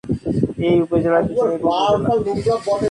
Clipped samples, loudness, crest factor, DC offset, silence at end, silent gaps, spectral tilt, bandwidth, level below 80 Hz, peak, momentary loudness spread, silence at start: under 0.1%; -18 LUFS; 14 dB; under 0.1%; 0 s; none; -7 dB/octave; 11 kHz; -44 dBFS; -4 dBFS; 4 LU; 0.05 s